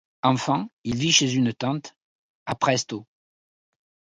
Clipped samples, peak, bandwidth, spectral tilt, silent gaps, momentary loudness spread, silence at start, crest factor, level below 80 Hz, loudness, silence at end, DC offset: under 0.1%; -4 dBFS; 11 kHz; -3.5 dB/octave; 0.73-0.84 s, 1.96-2.46 s; 15 LU; 0.25 s; 22 dB; -60 dBFS; -23 LUFS; 1.15 s; under 0.1%